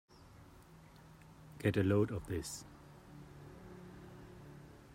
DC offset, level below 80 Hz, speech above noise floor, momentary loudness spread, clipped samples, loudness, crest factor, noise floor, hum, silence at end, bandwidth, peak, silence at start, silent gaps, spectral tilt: under 0.1%; -62 dBFS; 24 dB; 26 LU; under 0.1%; -36 LUFS; 22 dB; -59 dBFS; none; 0 s; 16 kHz; -20 dBFS; 0.35 s; none; -6.5 dB/octave